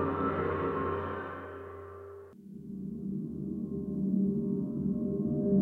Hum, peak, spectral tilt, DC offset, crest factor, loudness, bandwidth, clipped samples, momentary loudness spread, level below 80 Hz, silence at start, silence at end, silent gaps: none; -16 dBFS; -10.5 dB/octave; under 0.1%; 16 dB; -34 LUFS; 4 kHz; under 0.1%; 16 LU; -60 dBFS; 0 s; 0 s; none